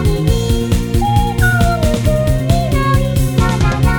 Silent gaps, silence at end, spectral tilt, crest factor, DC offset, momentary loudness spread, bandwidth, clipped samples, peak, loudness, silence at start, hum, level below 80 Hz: none; 0 s; -6 dB/octave; 12 dB; 0.2%; 2 LU; 19 kHz; under 0.1%; 0 dBFS; -14 LUFS; 0 s; none; -18 dBFS